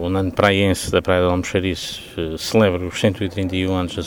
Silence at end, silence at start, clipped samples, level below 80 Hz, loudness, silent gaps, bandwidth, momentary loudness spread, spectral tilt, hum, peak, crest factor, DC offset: 0 s; 0 s; under 0.1%; -42 dBFS; -19 LUFS; none; 19.5 kHz; 9 LU; -5.5 dB/octave; none; 0 dBFS; 18 dB; under 0.1%